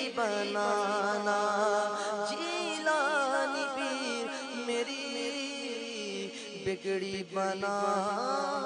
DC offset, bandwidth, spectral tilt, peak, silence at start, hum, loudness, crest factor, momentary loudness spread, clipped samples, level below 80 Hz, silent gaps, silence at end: under 0.1%; 10.5 kHz; -3 dB/octave; -16 dBFS; 0 s; none; -32 LUFS; 16 dB; 8 LU; under 0.1%; -76 dBFS; none; 0 s